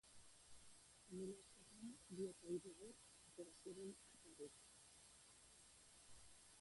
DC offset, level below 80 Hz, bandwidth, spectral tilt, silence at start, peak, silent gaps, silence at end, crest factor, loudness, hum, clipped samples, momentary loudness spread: under 0.1%; -82 dBFS; 11.5 kHz; -4.5 dB/octave; 0.05 s; -38 dBFS; none; 0 s; 20 dB; -58 LUFS; none; under 0.1%; 14 LU